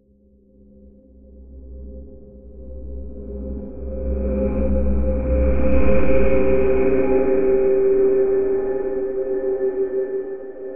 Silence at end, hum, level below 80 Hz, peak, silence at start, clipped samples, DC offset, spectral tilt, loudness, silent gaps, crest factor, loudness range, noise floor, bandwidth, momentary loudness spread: 0 s; none; -28 dBFS; -2 dBFS; 0 s; under 0.1%; under 0.1%; -12.5 dB/octave; -20 LUFS; none; 16 dB; 18 LU; -54 dBFS; 3.2 kHz; 19 LU